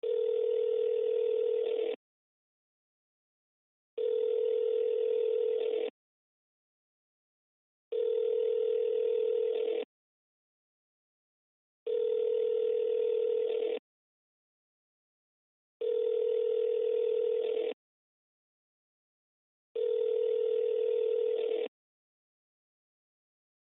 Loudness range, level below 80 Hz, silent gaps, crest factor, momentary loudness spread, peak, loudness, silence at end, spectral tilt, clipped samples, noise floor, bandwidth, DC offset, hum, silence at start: 3 LU; under -90 dBFS; 1.96-3.97 s, 5.90-7.91 s, 9.85-11.86 s, 13.79-15.80 s, 17.73-19.75 s; 10 dB; 7 LU; -22 dBFS; -31 LUFS; 2.05 s; 0.5 dB/octave; under 0.1%; under -90 dBFS; 3.9 kHz; under 0.1%; none; 0.05 s